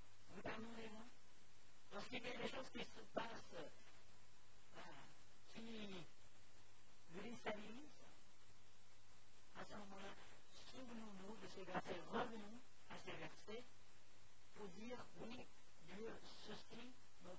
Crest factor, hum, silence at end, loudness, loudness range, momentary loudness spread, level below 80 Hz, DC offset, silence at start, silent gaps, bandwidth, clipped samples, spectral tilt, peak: 26 dB; none; 0 s; -55 LUFS; 7 LU; 16 LU; -78 dBFS; 0.3%; 0 s; none; 8 kHz; under 0.1%; -4.5 dB/octave; -30 dBFS